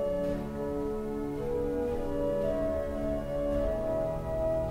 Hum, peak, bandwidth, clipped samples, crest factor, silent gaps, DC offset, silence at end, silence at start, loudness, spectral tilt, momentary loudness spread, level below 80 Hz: none; -20 dBFS; 16 kHz; under 0.1%; 12 dB; none; under 0.1%; 0 s; 0 s; -32 LUFS; -8 dB/octave; 4 LU; -40 dBFS